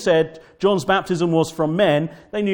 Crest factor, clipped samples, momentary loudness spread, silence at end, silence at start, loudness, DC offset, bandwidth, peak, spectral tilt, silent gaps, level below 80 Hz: 14 dB; under 0.1%; 7 LU; 0 s; 0 s; -20 LUFS; under 0.1%; 18 kHz; -4 dBFS; -6 dB/octave; none; -54 dBFS